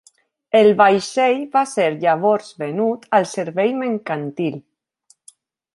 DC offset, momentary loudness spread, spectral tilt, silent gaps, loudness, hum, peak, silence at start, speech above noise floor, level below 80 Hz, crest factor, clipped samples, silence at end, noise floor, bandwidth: under 0.1%; 11 LU; -5 dB/octave; none; -18 LUFS; none; -2 dBFS; 0.55 s; 41 dB; -68 dBFS; 18 dB; under 0.1%; 1.15 s; -59 dBFS; 11.5 kHz